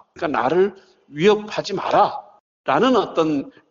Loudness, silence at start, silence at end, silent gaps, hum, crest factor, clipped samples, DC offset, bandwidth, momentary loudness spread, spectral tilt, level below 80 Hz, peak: -20 LUFS; 0.15 s; 0.2 s; 2.40-2.64 s; none; 16 dB; under 0.1%; under 0.1%; 7.6 kHz; 9 LU; -3.5 dB/octave; -60 dBFS; -4 dBFS